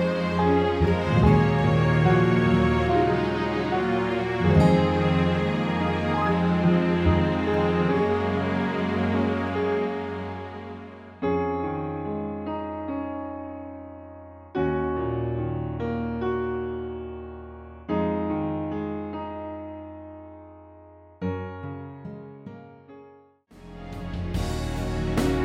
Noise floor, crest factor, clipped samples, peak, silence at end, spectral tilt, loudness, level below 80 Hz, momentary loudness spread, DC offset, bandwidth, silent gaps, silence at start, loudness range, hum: -53 dBFS; 18 dB; under 0.1%; -6 dBFS; 0 s; -8 dB/octave; -25 LUFS; -40 dBFS; 19 LU; under 0.1%; 11.5 kHz; none; 0 s; 15 LU; none